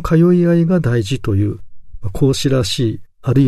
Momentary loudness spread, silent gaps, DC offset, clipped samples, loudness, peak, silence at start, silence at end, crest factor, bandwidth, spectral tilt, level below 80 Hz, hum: 13 LU; none; under 0.1%; under 0.1%; -16 LUFS; -2 dBFS; 0 s; 0 s; 14 dB; 13.5 kHz; -7 dB/octave; -36 dBFS; none